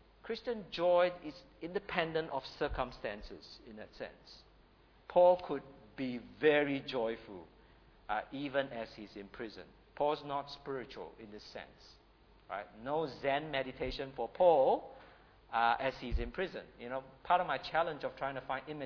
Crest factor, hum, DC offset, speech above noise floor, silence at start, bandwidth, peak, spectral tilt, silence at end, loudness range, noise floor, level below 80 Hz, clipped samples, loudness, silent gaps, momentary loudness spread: 22 dB; none; under 0.1%; 29 dB; 0.25 s; 5.4 kHz; -14 dBFS; -3 dB/octave; 0 s; 8 LU; -64 dBFS; -54 dBFS; under 0.1%; -35 LUFS; none; 20 LU